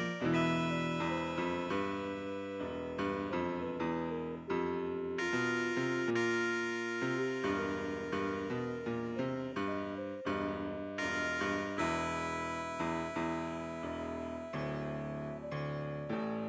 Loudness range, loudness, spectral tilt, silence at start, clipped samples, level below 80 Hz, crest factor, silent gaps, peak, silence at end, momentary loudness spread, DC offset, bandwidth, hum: 4 LU; -36 LUFS; -6 dB/octave; 0 s; under 0.1%; -60 dBFS; 16 dB; none; -22 dBFS; 0 s; 7 LU; under 0.1%; 8 kHz; none